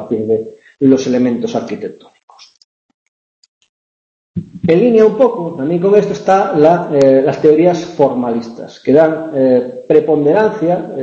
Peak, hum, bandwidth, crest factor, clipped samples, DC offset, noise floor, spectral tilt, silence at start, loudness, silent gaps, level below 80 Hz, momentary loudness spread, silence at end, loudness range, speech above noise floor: 0 dBFS; none; 7.8 kHz; 14 dB; under 0.1%; under 0.1%; under -90 dBFS; -7.5 dB/octave; 0 s; -12 LUFS; 2.23-2.28 s, 2.64-3.61 s, 3.69-4.34 s; -54 dBFS; 12 LU; 0 s; 11 LU; over 78 dB